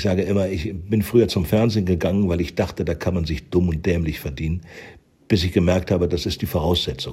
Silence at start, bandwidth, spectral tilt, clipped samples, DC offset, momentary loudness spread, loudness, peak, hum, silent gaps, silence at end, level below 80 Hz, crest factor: 0 s; 16 kHz; -6.5 dB/octave; under 0.1%; under 0.1%; 8 LU; -21 LUFS; -4 dBFS; none; none; 0 s; -36 dBFS; 18 dB